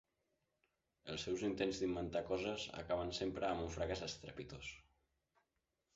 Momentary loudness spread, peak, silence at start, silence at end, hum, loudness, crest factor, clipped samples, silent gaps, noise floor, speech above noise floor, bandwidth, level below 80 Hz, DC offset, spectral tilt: 11 LU; -24 dBFS; 1.05 s; 1.15 s; none; -43 LUFS; 20 dB; under 0.1%; none; -87 dBFS; 45 dB; 8 kHz; -62 dBFS; under 0.1%; -4 dB/octave